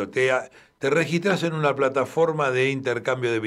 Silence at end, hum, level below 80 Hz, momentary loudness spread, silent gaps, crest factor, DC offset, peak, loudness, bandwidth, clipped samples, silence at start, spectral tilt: 0 s; none; -68 dBFS; 4 LU; none; 16 dB; under 0.1%; -8 dBFS; -23 LUFS; 13.5 kHz; under 0.1%; 0 s; -5.5 dB/octave